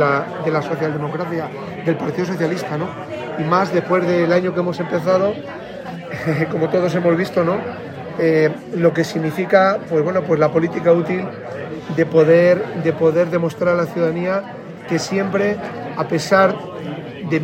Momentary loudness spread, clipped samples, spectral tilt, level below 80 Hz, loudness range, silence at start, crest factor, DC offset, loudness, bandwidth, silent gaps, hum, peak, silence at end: 14 LU; under 0.1%; -7 dB/octave; -58 dBFS; 4 LU; 0 s; 18 dB; under 0.1%; -18 LUFS; 15.5 kHz; none; none; 0 dBFS; 0 s